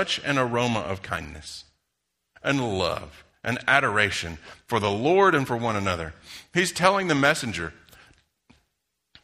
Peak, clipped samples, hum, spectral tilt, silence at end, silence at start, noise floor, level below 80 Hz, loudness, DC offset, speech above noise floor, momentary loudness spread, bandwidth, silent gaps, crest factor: -2 dBFS; under 0.1%; none; -4.5 dB/octave; 1.5 s; 0 s; -79 dBFS; -52 dBFS; -24 LUFS; under 0.1%; 54 dB; 16 LU; 15 kHz; none; 24 dB